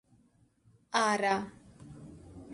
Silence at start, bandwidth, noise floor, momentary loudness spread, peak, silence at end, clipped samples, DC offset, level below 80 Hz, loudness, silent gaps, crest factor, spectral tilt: 0.9 s; 11.5 kHz; -67 dBFS; 23 LU; -14 dBFS; 0 s; under 0.1%; under 0.1%; -64 dBFS; -30 LUFS; none; 20 dB; -3.5 dB/octave